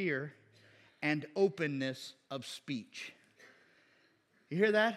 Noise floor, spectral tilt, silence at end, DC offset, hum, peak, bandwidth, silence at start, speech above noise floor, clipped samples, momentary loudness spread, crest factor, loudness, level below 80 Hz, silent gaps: -71 dBFS; -5.5 dB/octave; 0 s; under 0.1%; none; -16 dBFS; 13.5 kHz; 0 s; 36 dB; under 0.1%; 15 LU; 22 dB; -36 LUFS; under -90 dBFS; none